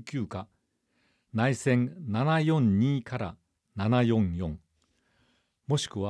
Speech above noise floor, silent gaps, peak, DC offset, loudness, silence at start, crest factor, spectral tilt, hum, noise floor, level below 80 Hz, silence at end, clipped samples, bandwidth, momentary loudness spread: 47 dB; none; -12 dBFS; under 0.1%; -28 LUFS; 0 s; 18 dB; -6.5 dB/octave; none; -74 dBFS; -56 dBFS; 0 s; under 0.1%; 11 kHz; 14 LU